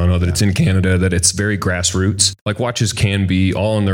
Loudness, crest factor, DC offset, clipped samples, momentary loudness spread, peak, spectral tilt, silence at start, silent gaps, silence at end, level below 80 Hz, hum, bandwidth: -16 LUFS; 16 dB; under 0.1%; under 0.1%; 4 LU; 0 dBFS; -4.5 dB/octave; 0 s; 2.41-2.46 s; 0 s; -34 dBFS; none; 16.5 kHz